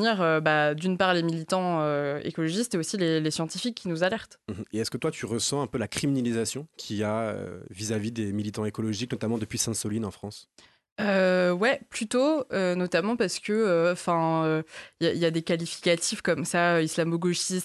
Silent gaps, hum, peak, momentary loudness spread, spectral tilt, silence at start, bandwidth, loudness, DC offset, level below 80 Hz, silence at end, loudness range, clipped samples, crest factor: 10.92-10.96 s; none; -8 dBFS; 9 LU; -4.5 dB/octave; 0 s; 12.5 kHz; -27 LUFS; under 0.1%; -60 dBFS; 0 s; 5 LU; under 0.1%; 20 dB